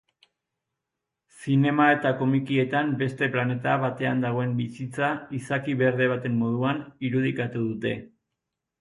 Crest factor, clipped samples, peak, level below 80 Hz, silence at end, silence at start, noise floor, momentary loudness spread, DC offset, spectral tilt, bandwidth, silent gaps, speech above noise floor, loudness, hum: 18 dB; under 0.1%; -8 dBFS; -66 dBFS; 0.75 s; 1.35 s; -85 dBFS; 9 LU; under 0.1%; -7.5 dB/octave; 11 kHz; none; 60 dB; -25 LUFS; none